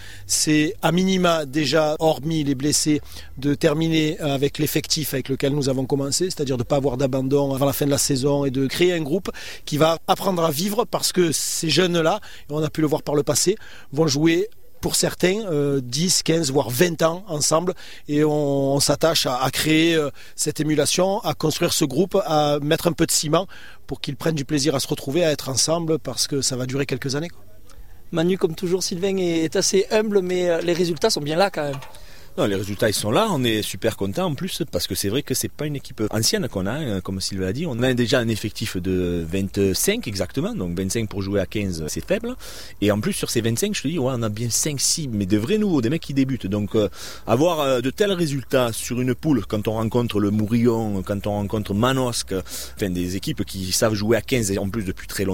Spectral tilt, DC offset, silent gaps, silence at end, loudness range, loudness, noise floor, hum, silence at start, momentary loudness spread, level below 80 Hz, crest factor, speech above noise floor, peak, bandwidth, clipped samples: -4.5 dB/octave; 1%; none; 0 s; 3 LU; -21 LUFS; -43 dBFS; none; 0 s; 7 LU; -46 dBFS; 18 dB; 22 dB; -4 dBFS; 16.5 kHz; under 0.1%